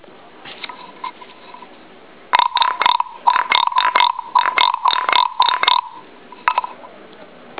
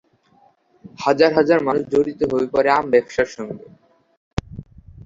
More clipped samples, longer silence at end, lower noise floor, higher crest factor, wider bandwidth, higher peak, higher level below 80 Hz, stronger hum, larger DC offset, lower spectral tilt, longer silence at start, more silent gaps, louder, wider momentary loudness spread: neither; about the same, 0.05 s vs 0.05 s; second, -43 dBFS vs -57 dBFS; about the same, 18 dB vs 18 dB; second, 4 kHz vs 7.8 kHz; about the same, 0 dBFS vs -2 dBFS; second, -66 dBFS vs -44 dBFS; neither; first, 0.4% vs under 0.1%; second, -4 dB/octave vs -6 dB/octave; second, 0.45 s vs 0.85 s; second, none vs 4.17-4.37 s; first, -16 LUFS vs -19 LUFS; about the same, 18 LU vs 17 LU